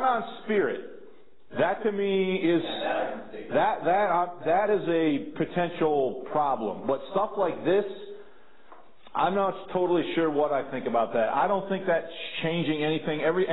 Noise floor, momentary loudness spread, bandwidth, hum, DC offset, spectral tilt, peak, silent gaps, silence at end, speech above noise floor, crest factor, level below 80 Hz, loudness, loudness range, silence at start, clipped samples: -56 dBFS; 6 LU; 4.1 kHz; none; 0.6%; -10 dB/octave; -12 dBFS; none; 0 s; 29 dB; 14 dB; -68 dBFS; -27 LUFS; 3 LU; 0 s; under 0.1%